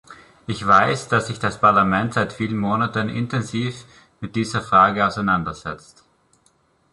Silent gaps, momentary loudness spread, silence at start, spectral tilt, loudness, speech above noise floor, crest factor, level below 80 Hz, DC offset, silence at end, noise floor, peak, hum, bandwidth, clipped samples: none; 16 LU; 0.1 s; -5.5 dB/octave; -20 LUFS; 41 dB; 20 dB; -50 dBFS; under 0.1%; 1.15 s; -61 dBFS; -2 dBFS; none; 11.5 kHz; under 0.1%